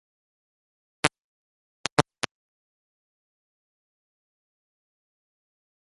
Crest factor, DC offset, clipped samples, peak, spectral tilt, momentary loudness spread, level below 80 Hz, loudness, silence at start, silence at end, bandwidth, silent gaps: 36 dB; under 0.1%; under 0.1%; 0 dBFS; -3 dB/octave; 9 LU; -64 dBFS; -28 LUFS; 1.05 s; 3.8 s; 6.6 kHz; 1.20-1.84 s, 1.92-1.97 s